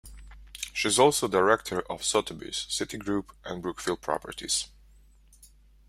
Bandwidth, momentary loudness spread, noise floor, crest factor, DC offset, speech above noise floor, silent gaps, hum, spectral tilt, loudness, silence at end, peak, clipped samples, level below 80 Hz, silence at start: 16 kHz; 14 LU; -57 dBFS; 24 dB; under 0.1%; 29 dB; none; none; -2.5 dB/octave; -28 LUFS; 1.2 s; -6 dBFS; under 0.1%; -54 dBFS; 0.05 s